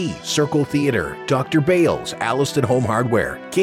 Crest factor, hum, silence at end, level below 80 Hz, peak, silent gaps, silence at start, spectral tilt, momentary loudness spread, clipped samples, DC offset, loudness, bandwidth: 14 dB; none; 0 s; -48 dBFS; -4 dBFS; none; 0 s; -5.5 dB/octave; 5 LU; under 0.1%; under 0.1%; -19 LUFS; 16 kHz